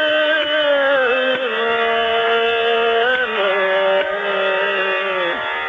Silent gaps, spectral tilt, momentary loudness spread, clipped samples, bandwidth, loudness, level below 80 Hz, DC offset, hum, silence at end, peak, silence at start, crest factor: none; -4 dB/octave; 3 LU; under 0.1%; 7.6 kHz; -16 LUFS; -58 dBFS; under 0.1%; none; 0 s; -6 dBFS; 0 s; 12 dB